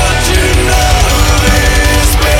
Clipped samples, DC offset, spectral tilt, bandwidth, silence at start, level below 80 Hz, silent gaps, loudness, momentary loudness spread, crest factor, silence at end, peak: 0.1%; under 0.1%; -3.5 dB/octave; 17 kHz; 0 s; -12 dBFS; none; -9 LUFS; 1 LU; 8 dB; 0 s; 0 dBFS